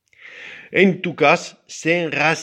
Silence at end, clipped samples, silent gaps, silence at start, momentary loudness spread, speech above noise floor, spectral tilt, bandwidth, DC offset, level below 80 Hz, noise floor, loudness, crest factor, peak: 0 s; under 0.1%; none; 0.25 s; 20 LU; 22 dB; -5 dB/octave; 11 kHz; under 0.1%; -68 dBFS; -40 dBFS; -18 LUFS; 20 dB; 0 dBFS